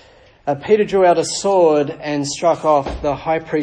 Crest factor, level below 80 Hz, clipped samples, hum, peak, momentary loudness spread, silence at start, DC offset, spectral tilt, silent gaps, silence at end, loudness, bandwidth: 14 dB; -42 dBFS; under 0.1%; none; -2 dBFS; 9 LU; 0.45 s; under 0.1%; -4.5 dB/octave; none; 0 s; -17 LUFS; 10 kHz